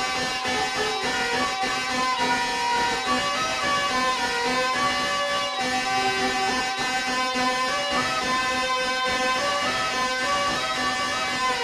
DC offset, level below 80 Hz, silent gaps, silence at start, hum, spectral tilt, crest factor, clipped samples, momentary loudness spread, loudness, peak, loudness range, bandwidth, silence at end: under 0.1%; -52 dBFS; none; 0 s; none; -1.5 dB/octave; 12 dB; under 0.1%; 2 LU; -23 LUFS; -12 dBFS; 0 LU; 14 kHz; 0 s